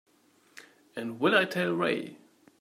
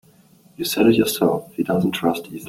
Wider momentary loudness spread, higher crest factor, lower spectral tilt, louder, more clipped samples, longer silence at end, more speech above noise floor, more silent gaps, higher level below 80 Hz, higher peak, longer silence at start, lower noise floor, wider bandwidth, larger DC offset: first, 17 LU vs 8 LU; about the same, 22 dB vs 18 dB; about the same, -5.5 dB/octave vs -5 dB/octave; second, -28 LUFS vs -20 LUFS; neither; first, 0.45 s vs 0 s; first, 37 dB vs 33 dB; neither; second, -80 dBFS vs -56 dBFS; second, -8 dBFS vs -4 dBFS; about the same, 0.55 s vs 0.6 s; first, -65 dBFS vs -52 dBFS; about the same, 16 kHz vs 17 kHz; neither